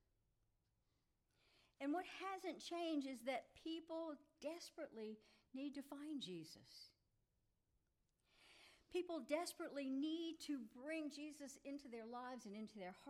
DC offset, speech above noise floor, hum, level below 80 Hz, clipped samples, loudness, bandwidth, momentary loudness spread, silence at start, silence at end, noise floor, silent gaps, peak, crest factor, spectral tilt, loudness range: under 0.1%; 36 dB; none; -86 dBFS; under 0.1%; -50 LUFS; 15.5 kHz; 13 LU; 1.8 s; 0 s; -86 dBFS; none; -30 dBFS; 20 dB; -4 dB/octave; 7 LU